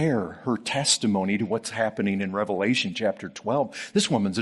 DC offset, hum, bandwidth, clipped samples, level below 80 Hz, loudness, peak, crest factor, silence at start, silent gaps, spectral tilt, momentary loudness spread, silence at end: under 0.1%; none; 11.5 kHz; under 0.1%; -66 dBFS; -25 LUFS; -8 dBFS; 18 dB; 0 s; none; -4 dB/octave; 6 LU; 0 s